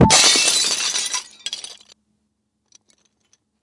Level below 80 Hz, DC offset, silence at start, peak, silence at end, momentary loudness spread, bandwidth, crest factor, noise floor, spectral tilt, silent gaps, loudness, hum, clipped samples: -42 dBFS; under 0.1%; 0 s; 0 dBFS; 1.9 s; 19 LU; 11.5 kHz; 20 dB; -71 dBFS; -2 dB/octave; none; -15 LUFS; none; under 0.1%